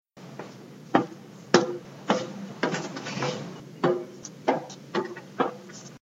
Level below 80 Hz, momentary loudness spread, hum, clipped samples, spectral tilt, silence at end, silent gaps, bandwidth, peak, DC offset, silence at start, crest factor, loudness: -74 dBFS; 19 LU; none; under 0.1%; -4.5 dB/octave; 0.05 s; none; 9.6 kHz; 0 dBFS; under 0.1%; 0.15 s; 28 dB; -29 LUFS